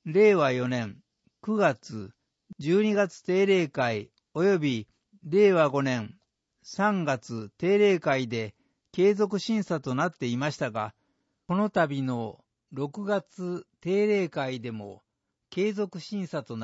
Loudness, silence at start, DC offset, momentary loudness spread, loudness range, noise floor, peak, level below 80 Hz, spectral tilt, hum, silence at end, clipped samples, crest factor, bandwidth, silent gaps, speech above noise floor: -27 LUFS; 0.05 s; under 0.1%; 16 LU; 5 LU; -75 dBFS; -10 dBFS; -72 dBFS; -6.5 dB/octave; none; 0 s; under 0.1%; 18 dB; 8 kHz; none; 49 dB